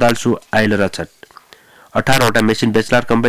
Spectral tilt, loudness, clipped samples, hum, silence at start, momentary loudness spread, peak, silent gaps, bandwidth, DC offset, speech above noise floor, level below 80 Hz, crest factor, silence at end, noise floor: -5 dB/octave; -15 LUFS; under 0.1%; none; 0 s; 9 LU; -4 dBFS; none; 16 kHz; under 0.1%; 31 dB; -40 dBFS; 12 dB; 0 s; -45 dBFS